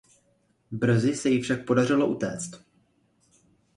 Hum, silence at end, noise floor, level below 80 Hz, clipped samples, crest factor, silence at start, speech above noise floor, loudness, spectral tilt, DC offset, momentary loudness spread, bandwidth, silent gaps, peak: none; 1.2 s; -68 dBFS; -62 dBFS; under 0.1%; 18 dB; 0.7 s; 43 dB; -25 LUFS; -6 dB/octave; under 0.1%; 13 LU; 11.5 kHz; none; -8 dBFS